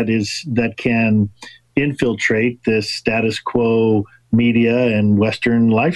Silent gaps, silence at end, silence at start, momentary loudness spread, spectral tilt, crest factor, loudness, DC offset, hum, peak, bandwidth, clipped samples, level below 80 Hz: none; 0 s; 0 s; 6 LU; -6.5 dB/octave; 14 dB; -17 LUFS; under 0.1%; none; -2 dBFS; 11.5 kHz; under 0.1%; -46 dBFS